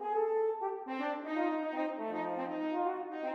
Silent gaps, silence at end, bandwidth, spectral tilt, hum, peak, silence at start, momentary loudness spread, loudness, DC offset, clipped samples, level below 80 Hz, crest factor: none; 0 s; 6.2 kHz; -7 dB/octave; none; -22 dBFS; 0 s; 5 LU; -35 LUFS; under 0.1%; under 0.1%; under -90 dBFS; 14 dB